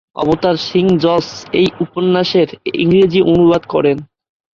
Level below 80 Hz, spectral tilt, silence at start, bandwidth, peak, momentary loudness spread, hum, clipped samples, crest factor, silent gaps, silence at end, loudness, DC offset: -46 dBFS; -7 dB/octave; 0.15 s; 7.2 kHz; -2 dBFS; 7 LU; none; under 0.1%; 12 dB; none; 0.55 s; -14 LUFS; under 0.1%